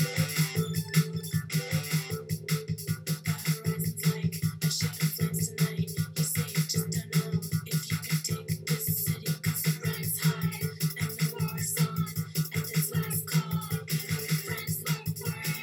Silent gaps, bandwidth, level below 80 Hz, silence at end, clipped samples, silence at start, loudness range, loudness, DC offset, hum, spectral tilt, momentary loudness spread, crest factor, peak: none; 18 kHz; -62 dBFS; 0 s; under 0.1%; 0 s; 1 LU; -30 LUFS; under 0.1%; none; -4.5 dB/octave; 4 LU; 18 dB; -12 dBFS